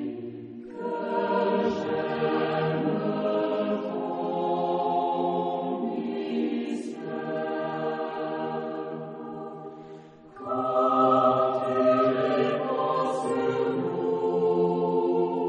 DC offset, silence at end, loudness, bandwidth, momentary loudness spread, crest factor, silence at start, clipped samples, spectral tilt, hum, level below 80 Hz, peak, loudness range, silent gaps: under 0.1%; 0 s; -27 LUFS; 9.6 kHz; 14 LU; 16 dB; 0 s; under 0.1%; -7.5 dB/octave; none; -70 dBFS; -10 dBFS; 8 LU; none